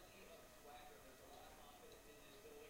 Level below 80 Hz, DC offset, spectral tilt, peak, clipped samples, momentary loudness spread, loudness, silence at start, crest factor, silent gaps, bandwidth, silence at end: -72 dBFS; under 0.1%; -3 dB/octave; -48 dBFS; under 0.1%; 2 LU; -61 LUFS; 0 s; 14 dB; none; 16 kHz; 0 s